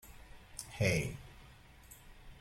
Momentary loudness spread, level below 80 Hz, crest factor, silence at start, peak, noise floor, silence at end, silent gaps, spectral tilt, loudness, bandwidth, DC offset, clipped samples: 26 LU; -54 dBFS; 22 dB; 0.05 s; -20 dBFS; -58 dBFS; 0 s; none; -5 dB/octave; -36 LUFS; 16.5 kHz; under 0.1%; under 0.1%